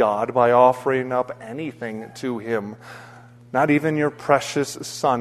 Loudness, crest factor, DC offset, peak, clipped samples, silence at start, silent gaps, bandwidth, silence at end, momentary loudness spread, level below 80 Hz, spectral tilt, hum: -21 LUFS; 20 dB; under 0.1%; 0 dBFS; under 0.1%; 0 s; none; 13.5 kHz; 0 s; 15 LU; -62 dBFS; -5.5 dB/octave; none